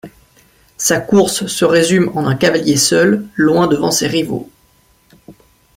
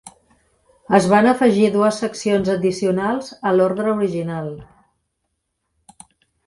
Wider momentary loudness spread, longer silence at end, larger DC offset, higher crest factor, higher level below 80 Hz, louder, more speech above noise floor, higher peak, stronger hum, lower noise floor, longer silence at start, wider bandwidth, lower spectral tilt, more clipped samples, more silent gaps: second, 6 LU vs 11 LU; second, 0.45 s vs 1.85 s; neither; second, 14 dB vs 20 dB; first, -50 dBFS vs -56 dBFS; first, -13 LUFS vs -18 LUFS; second, 40 dB vs 57 dB; about the same, -2 dBFS vs 0 dBFS; neither; second, -53 dBFS vs -74 dBFS; about the same, 0.05 s vs 0.05 s; first, 16.5 kHz vs 11.5 kHz; second, -4 dB/octave vs -6 dB/octave; neither; neither